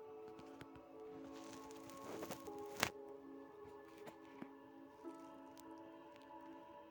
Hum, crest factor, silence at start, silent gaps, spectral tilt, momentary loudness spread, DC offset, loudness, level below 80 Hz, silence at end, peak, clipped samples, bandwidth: none; 44 dB; 0 s; none; -3 dB/octave; 14 LU; under 0.1%; -52 LUFS; -82 dBFS; 0 s; -8 dBFS; under 0.1%; 19 kHz